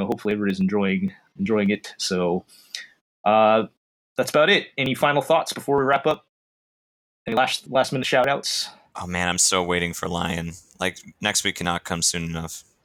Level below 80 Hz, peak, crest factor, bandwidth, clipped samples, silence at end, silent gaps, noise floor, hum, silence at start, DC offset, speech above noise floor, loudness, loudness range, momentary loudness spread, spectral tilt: -54 dBFS; -6 dBFS; 18 dB; 19 kHz; under 0.1%; 0.25 s; 3.01-3.24 s, 3.77-4.16 s, 6.29-7.26 s; under -90 dBFS; none; 0 s; under 0.1%; over 67 dB; -22 LUFS; 3 LU; 13 LU; -3.5 dB/octave